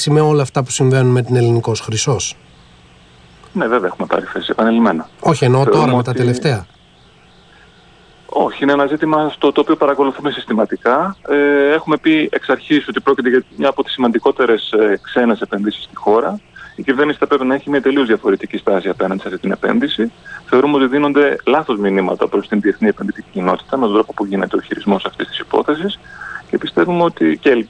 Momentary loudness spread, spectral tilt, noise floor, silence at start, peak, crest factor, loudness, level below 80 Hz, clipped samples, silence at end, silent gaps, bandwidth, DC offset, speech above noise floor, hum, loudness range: 8 LU; -5.5 dB/octave; -47 dBFS; 0 s; -2 dBFS; 14 dB; -15 LUFS; -52 dBFS; under 0.1%; 0.05 s; none; 10.5 kHz; under 0.1%; 32 dB; none; 3 LU